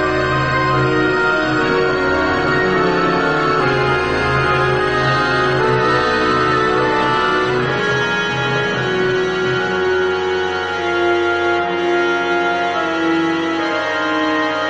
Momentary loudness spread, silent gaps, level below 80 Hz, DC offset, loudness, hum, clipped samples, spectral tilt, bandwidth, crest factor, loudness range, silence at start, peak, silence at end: 3 LU; none; -40 dBFS; 0.4%; -16 LUFS; none; under 0.1%; -5.5 dB/octave; 9 kHz; 12 dB; 2 LU; 0 s; -4 dBFS; 0 s